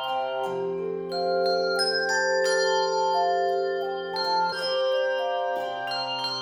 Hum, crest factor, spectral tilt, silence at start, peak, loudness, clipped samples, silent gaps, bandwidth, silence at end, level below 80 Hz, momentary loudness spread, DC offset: none; 12 dB; -2.5 dB/octave; 0 s; -12 dBFS; -25 LUFS; under 0.1%; none; 15 kHz; 0 s; -72 dBFS; 7 LU; under 0.1%